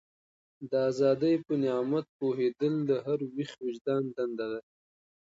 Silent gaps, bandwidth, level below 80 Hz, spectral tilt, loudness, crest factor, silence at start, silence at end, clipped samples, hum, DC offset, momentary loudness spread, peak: 2.09-2.19 s, 3.81-3.85 s; 7.8 kHz; -76 dBFS; -7.5 dB/octave; -30 LUFS; 16 dB; 0.6 s; 0.8 s; under 0.1%; none; under 0.1%; 10 LU; -16 dBFS